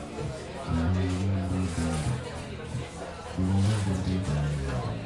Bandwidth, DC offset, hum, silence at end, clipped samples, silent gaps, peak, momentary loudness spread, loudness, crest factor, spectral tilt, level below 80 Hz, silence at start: 11.5 kHz; under 0.1%; none; 0 s; under 0.1%; none; -16 dBFS; 10 LU; -30 LUFS; 12 dB; -6.5 dB/octave; -42 dBFS; 0 s